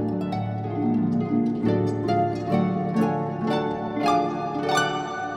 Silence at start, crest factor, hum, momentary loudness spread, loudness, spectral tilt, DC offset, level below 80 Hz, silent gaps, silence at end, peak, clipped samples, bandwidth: 0 s; 16 dB; none; 5 LU; -24 LUFS; -6.5 dB/octave; under 0.1%; -56 dBFS; none; 0 s; -8 dBFS; under 0.1%; 13 kHz